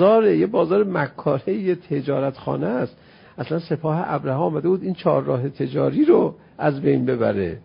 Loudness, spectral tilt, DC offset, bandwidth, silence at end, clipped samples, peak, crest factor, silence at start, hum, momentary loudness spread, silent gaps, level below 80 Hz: -21 LUFS; -12.5 dB/octave; under 0.1%; 5.4 kHz; 0.05 s; under 0.1%; -4 dBFS; 16 dB; 0 s; none; 8 LU; none; -54 dBFS